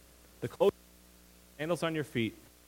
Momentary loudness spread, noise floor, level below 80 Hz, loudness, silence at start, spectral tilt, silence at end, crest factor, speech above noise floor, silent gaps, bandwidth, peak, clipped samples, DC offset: 12 LU; -59 dBFS; -64 dBFS; -34 LUFS; 0.4 s; -5.5 dB/octave; 0.3 s; 22 dB; 27 dB; none; 16.5 kHz; -14 dBFS; under 0.1%; under 0.1%